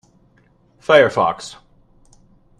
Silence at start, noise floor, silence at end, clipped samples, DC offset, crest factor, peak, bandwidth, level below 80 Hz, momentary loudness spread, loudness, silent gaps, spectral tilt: 0.9 s; -56 dBFS; 1.1 s; under 0.1%; under 0.1%; 20 dB; 0 dBFS; 11 kHz; -56 dBFS; 19 LU; -15 LUFS; none; -4.5 dB/octave